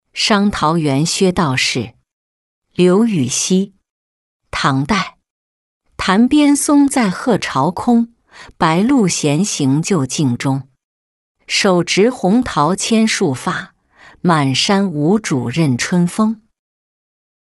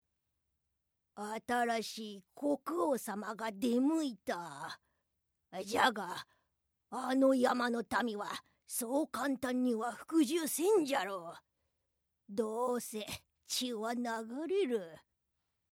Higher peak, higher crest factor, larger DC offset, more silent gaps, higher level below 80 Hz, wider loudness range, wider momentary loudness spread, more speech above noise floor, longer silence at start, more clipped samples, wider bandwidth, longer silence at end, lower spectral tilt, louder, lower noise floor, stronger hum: first, -2 dBFS vs -14 dBFS; second, 14 dB vs 22 dB; neither; first, 2.13-2.62 s, 3.91-4.40 s, 5.30-5.81 s, 10.84-11.35 s vs none; first, -48 dBFS vs -78 dBFS; about the same, 3 LU vs 4 LU; second, 8 LU vs 15 LU; second, 32 dB vs 48 dB; second, 0.15 s vs 1.15 s; neither; second, 12 kHz vs 17 kHz; first, 1.15 s vs 0.75 s; about the same, -4.5 dB/octave vs -3.5 dB/octave; first, -15 LUFS vs -35 LUFS; second, -46 dBFS vs -83 dBFS; neither